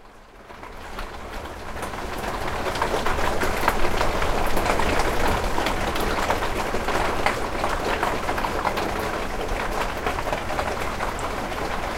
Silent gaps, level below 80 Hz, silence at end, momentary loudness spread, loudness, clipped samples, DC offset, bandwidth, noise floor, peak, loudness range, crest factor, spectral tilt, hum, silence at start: none; -32 dBFS; 0 s; 12 LU; -25 LUFS; under 0.1%; under 0.1%; 16.5 kHz; -45 dBFS; -4 dBFS; 3 LU; 20 dB; -4 dB/octave; none; 0 s